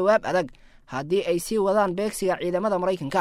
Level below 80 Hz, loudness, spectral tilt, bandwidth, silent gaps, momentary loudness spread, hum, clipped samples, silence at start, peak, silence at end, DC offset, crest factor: -52 dBFS; -24 LUFS; -5 dB/octave; 16 kHz; none; 7 LU; none; under 0.1%; 0 s; -8 dBFS; 0 s; under 0.1%; 16 dB